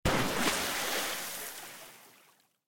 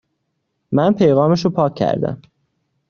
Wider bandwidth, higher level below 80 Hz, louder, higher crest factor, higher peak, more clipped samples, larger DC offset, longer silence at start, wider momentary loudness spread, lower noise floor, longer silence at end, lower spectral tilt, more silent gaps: first, 17 kHz vs 7.2 kHz; about the same, -50 dBFS vs -54 dBFS; second, -32 LUFS vs -17 LUFS; about the same, 18 dB vs 16 dB; second, -16 dBFS vs -2 dBFS; neither; neither; second, 0.05 s vs 0.7 s; first, 17 LU vs 10 LU; second, -65 dBFS vs -72 dBFS; second, 0.2 s vs 0.75 s; second, -2.5 dB/octave vs -7 dB/octave; neither